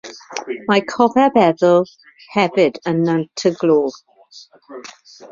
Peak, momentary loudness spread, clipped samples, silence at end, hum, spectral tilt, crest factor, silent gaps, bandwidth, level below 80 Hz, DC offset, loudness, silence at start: -2 dBFS; 21 LU; under 0.1%; 0.05 s; none; -6 dB/octave; 16 dB; none; 7.6 kHz; -60 dBFS; under 0.1%; -16 LUFS; 0.05 s